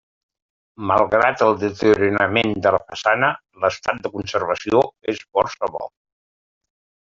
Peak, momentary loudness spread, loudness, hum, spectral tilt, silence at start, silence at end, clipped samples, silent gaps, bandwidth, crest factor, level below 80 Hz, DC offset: -2 dBFS; 10 LU; -19 LUFS; none; -5.5 dB/octave; 0.8 s; 1.2 s; under 0.1%; none; 7.6 kHz; 20 dB; -56 dBFS; under 0.1%